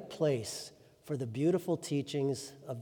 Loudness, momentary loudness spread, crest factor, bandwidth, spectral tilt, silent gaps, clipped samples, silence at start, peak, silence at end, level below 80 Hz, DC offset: -35 LUFS; 11 LU; 16 dB; 20 kHz; -6 dB/octave; none; under 0.1%; 0 s; -18 dBFS; 0 s; -76 dBFS; under 0.1%